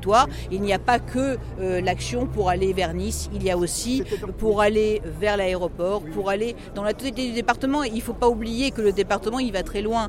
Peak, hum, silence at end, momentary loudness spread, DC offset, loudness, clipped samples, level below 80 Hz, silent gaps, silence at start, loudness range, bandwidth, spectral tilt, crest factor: -4 dBFS; none; 0 s; 7 LU; under 0.1%; -24 LUFS; under 0.1%; -36 dBFS; none; 0 s; 1 LU; 16.5 kHz; -5 dB/octave; 18 dB